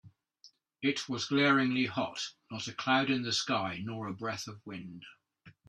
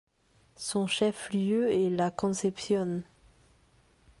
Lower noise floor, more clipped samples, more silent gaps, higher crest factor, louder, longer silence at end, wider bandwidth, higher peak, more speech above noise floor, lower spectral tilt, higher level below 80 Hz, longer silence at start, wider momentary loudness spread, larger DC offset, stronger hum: about the same, -63 dBFS vs -65 dBFS; neither; neither; about the same, 20 dB vs 18 dB; second, -32 LUFS vs -29 LUFS; second, 0.2 s vs 1.15 s; about the same, 12 kHz vs 11.5 kHz; about the same, -14 dBFS vs -14 dBFS; second, 31 dB vs 37 dB; about the same, -4 dB/octave vs -5 dB/octave; second, -74 dBFS vs -64 dBFS; second, 0.05 s vs 0.6 s; first, 17 LU vs 7 LU; neither; neither